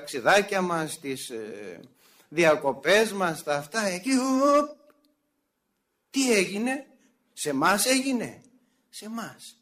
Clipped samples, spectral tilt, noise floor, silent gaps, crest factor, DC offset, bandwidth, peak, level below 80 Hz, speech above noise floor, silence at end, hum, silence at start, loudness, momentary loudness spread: under 0.1%; -3.5 dB/octave; -77 dBFS; none; 18 dB; under 0.1%; 15.5 kHz; -10 dBFS; -70 dBFS; 52 dB; 0.1 s; none; 0 s; -25 LUFS; 16 LU